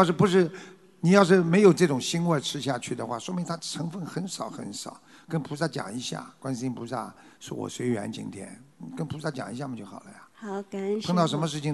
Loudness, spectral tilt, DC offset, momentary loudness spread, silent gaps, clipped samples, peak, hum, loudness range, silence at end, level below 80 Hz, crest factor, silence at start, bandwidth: -27 LUFS; -5.5 dB/octave; under 0.1%; 20 LU; none; under 0.1%; -4 dBFS; none; 11 LU; 0 s; -68 dBFS; 24 dB; 0 s; 12 kHz